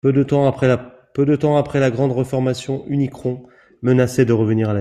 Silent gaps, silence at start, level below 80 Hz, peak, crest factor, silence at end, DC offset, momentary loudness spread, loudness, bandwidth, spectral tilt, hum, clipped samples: none; 0.05 s; -52 dBFS; -2 dBFS; 16 dB; 0 s; under 0.1%; 9 LU; -18 LUFS; 13 kHz; -7.5 dB/octave; none; under 0.1%